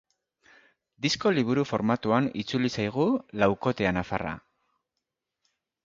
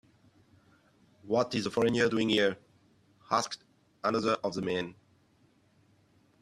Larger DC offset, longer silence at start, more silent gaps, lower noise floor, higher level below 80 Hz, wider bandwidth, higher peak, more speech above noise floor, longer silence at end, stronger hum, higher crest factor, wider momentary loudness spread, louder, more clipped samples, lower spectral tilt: neither; second, 1 s vs 1.25 s; neither; first, -85 dBFS vs -67 dBFS; first, -56 dBFS vs -68 dBFS; second, 7.8 kHz vs 13 kHz; first, -6 dBFS vs -12 dBFS; first, 58 dB vs 37 dB; about the same, 1.45 s vs 1.5 s; neither; about the same, 22 dB vs 22 dB; second, 7 LU vs 11 LU; first, -27 LUFS vs -30 LUFS; neither; about the same, -5.5 dB/octave vs -4.5 dB/octave